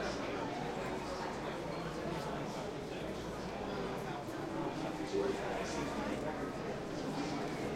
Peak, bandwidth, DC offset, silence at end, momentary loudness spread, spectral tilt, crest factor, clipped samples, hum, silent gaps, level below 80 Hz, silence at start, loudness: -24 dBFS; 16 kHz; under 0.1%; 0 s; 4 LU; -5.5 dB/octave; 16 dB; under 0.1%; none; none; -58 dBFS; 0 s; -40 LUFS